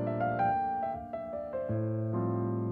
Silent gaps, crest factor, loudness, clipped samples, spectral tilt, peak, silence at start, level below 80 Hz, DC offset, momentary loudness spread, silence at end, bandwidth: none; 12 dB; -33 LUFS; under 0.1%; -11 dB/octave; -20 dBFS; 0 s; -62 dBFS; under 0.1%; 8 LU; 0 s; 4.3 kHz